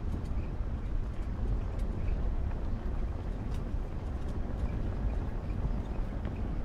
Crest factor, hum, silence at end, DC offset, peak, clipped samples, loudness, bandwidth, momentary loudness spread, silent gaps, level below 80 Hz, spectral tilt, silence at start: 12 dB; none; 0 s; under 0.1%; -20 dBFS; under 0.1%; -37 LUFS; 7.2 kHz; 3 LU; none; -34 dBFS; -8.5 dB/octave; 0 s